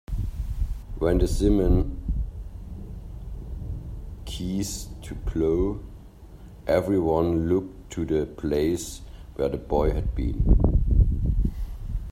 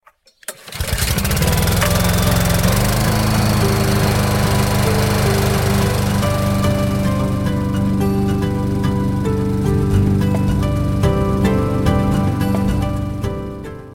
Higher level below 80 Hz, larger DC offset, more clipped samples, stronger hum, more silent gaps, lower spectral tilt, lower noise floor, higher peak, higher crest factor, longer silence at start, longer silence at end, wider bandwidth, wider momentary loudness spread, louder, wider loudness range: about the same, -28 dBFS vs -26 dBFS; neither; neither; neither; neither; first, -7 dB/octave vs -5.5 dB/octave; first, -44 dBFS vs -36 dBFS; second, -6 dBFS vs -2 dBFS; first, 20 dB vs 14 dB; second, 0.1 s vs 0.5 s; about the same, 0 s vs 0 s; second, 15 kHz vs 17 kHz; first, 17 LU vs 6 LU; second, -26 LUFS vs -17 LUFS; first, 6 LU vs 2 LU